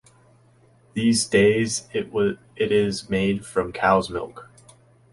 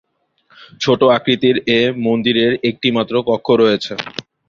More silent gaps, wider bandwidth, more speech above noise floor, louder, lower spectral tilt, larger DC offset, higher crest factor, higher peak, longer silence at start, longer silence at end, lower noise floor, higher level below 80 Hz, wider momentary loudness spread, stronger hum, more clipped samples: neither; first, 11.5 kHz vs 7.2 kHz; second, 34 dB vs 41 dB; second, -22 LUFS vs -15 LUFS; about the same, -4.5 dB/octave vs -5.5 dB/octave; neither; about the same, 20 dB vs 16 dB; second, -4 dBFS vs 0 dBFS; first, 0.95 s vs 0.6 s; first, 0.7 s vs 0.3 s; about the same, -56 dBFS vs -56 dBFS; about the same, -52 dBFS vs -54 dBFS; first, 11 LU vs 8 LU; neither; neither